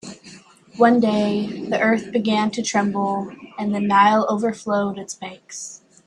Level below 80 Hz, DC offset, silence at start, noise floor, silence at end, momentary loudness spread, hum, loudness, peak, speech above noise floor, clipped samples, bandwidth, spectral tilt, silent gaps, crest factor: -64 dBFS; under 0.1%; 0.05 s; -45 dBFS; 0.3 s; 18 LU; none; -20 LUFS; -2 dBFS; 26 dB; under 0.1%; 11 kHz; -5 dB/octave; none; 18 dB